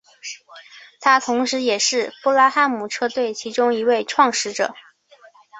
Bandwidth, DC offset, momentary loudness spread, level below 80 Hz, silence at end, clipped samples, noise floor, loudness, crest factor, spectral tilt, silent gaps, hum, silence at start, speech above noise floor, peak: 8.4 kHz; under 0.1%; 10 LU; -70 dBFS; 0 s; under 0.1%; -50 dBFS; -19 LUFS; 18 dB; -1.5 dB/octave; none; none; 0.25 s; 32 dB; -2 dBFS